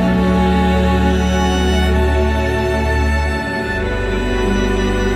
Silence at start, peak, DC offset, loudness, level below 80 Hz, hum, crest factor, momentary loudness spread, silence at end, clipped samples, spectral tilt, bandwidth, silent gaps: 0 s; -4 dBFS; under 0.1%; -16 LUFS; -20 dBFS; none; 12 dB; 5 LU; 0 s; under 0.1%; -6 dB/octave; 12.5 kHz; none